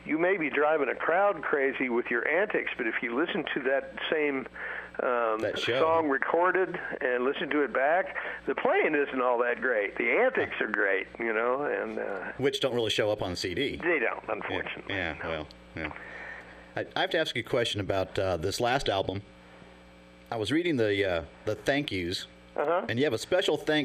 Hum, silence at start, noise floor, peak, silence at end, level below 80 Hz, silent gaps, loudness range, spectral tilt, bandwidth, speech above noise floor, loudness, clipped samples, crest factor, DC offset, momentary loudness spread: none; 0 s; -53 dBFS; -8 dBFS; 0 s; -58 dBFS; none; 5 LU; -4.5 dB/octave; 15 kHz; 24 dB; -28 LUFS; under 0.1%; 20 dB; under 0.1%; 10 LU